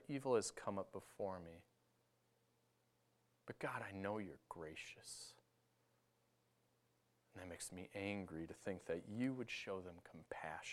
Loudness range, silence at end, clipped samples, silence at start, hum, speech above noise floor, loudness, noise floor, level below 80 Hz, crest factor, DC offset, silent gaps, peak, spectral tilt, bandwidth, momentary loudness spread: 9 LU; 0 s; under 0.1%; 0 s; none; 34 dB; -48 LUFS; -81 dBFS; -82 dBFS; 24 dB; under 0.1%; none; -26 dBFS; -4.5 dB/octave; 15.5 kHz; 16 LU